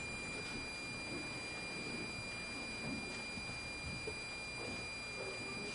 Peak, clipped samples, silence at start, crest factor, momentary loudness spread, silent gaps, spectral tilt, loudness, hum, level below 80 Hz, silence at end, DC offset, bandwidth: -32 dBFS; under 0.1%; 0 s; 12 dB; 1 LU; none; -3 dB/octave; -43 LUFS; 60 Hz at -60 dBFS; -60 dBFS; 0 s; under 0.1%; 11.5 kHz